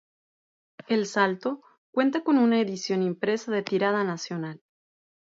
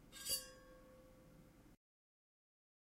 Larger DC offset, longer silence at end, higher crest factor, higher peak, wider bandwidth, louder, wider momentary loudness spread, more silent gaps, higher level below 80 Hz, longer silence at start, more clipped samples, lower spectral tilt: neither; second, 0.75 s vs 1.25 s; second, 18 dB vs 26 dB; first, -8 dBFS vs -28 dBFS; second, 7.8 kHz vs 16 kHz; first, -26 LUFS vs -44 LUFS; second, 11 LU vs 24 LU; first, 1.78-1.93 s vs none; second, -78 dBFS vs -72 dBFS; first, 0.9 s vs 0 s; neither; first, -5.5 dB/octave vs -0.5 dB/octave